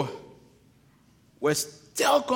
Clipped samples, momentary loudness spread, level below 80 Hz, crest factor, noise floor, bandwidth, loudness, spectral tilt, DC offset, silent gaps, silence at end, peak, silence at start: under 0.1%; 11 LU; -68 dBFS; 18 dB; -60 dBFS; 17 kHz; -27 LUFS; -3 dB/octave; under 0.1%; none; 0 s; -10 dBFS; 0 s